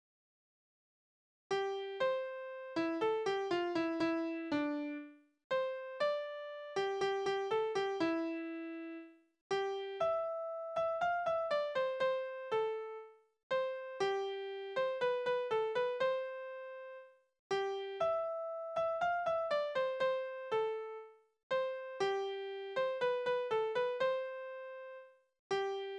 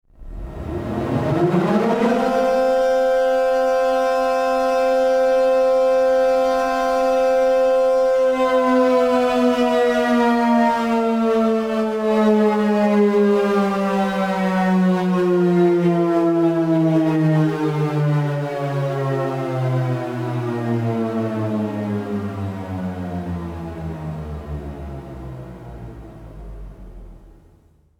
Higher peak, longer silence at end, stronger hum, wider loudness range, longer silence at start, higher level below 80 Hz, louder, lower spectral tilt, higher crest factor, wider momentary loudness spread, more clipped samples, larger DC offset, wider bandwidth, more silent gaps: second, -24 dBFS vs -6 dBFS; second, 0 s vs 0.7 s; neither; second, 2 LU vs 12 LU; first, 1.5 s vs 0.2 s; second, -78 dBFS vs -44 dBFS; second, -37 LUFS vs -18 LUFS; second, -4.5 dB/octave vs -7.5 dB/octave; about the same, 14 dB vs 12 dB; second, 11 LU vs 14 LU; neither; neither; second, 9.8 kHz vs 15.5 kHz; first, 5.44-5.50 s, 9.41-9.50 s, 13.43-13.50 s, 17.39-17.50 s, 21.43-21.50 s, 25.39-25.50 s vs none